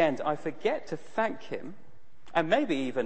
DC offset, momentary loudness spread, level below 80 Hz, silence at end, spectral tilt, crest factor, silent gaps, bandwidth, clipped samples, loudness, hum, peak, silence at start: 1%; 13 LU; -68 dBFS; 0 s; -6 dB/octave; 20 dB; none; 8.8 kHz; under 0.1%; -31 LUFS; none; -10 dBFS; 0 s